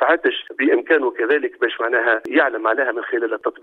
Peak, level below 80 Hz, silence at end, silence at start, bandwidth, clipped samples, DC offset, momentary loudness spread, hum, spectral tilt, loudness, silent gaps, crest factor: -2 dBFS; -72 dBFS; 0.1 s; 0 s; 4.3 kHz; under 0.1%; under 0.1%; 5 LU; none; -4.5 dB/octave; -19 LUFS; none; 18 dB